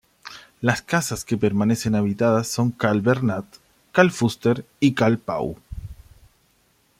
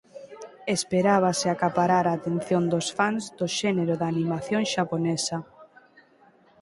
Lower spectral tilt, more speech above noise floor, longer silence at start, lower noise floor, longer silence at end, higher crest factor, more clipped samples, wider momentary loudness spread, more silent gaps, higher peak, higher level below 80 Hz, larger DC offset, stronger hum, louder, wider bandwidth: about the same, -6 dB/octave vs -5 dB/octave; first, 42 dB vs 33 dB; about the same, 0.25 s vs 0.15 s; first, -63 dBFS vs -58 dBFS; about the same, 1.05 s vs 0.95 s; about the same, 20 dB vs 18 dB; neither; first, 19 LU vs 8 LU; neither; first, -2 dBFS vs -8 dBFS; first, -50 dBFS vs -64 dBFS; neither; neither; first, -22 LUFS vs -25 LUFS; first, 16 kHz vs 11.5 kHz